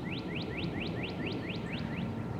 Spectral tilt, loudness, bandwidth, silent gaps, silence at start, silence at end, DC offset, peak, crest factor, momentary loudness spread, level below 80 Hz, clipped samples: -7 dB/octave; -37 LUFS; 14 kHz; none; 0 s; 0 s; under 0.1%; -24 dBFS; 14 dB; 1 LU; -52 dBFS; under 0.1%